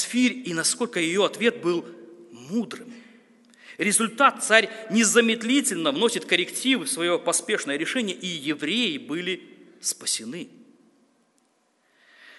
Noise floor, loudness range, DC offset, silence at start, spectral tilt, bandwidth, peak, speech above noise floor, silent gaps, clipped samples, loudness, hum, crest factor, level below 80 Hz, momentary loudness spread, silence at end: -67 dBFS; 8 LU; under 0.1%; 0 s; -2 dB/octave; 12 kHz; 0 dBFS; 43 dB; none; under 0.1%; -23 LUFS; none; 24 dB; -78 dBFS; 11 LU; 0.05 s